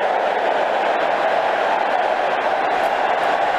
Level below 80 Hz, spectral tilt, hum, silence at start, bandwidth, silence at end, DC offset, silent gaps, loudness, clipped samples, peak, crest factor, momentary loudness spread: -58 dBFS; -3.5 dB/octave; none; 0 s; 13.5 kHz; 0 s; under 0.1%; none; -19 LUFS; under 0.1%; -6 dBFS; 12 dB; 1 LU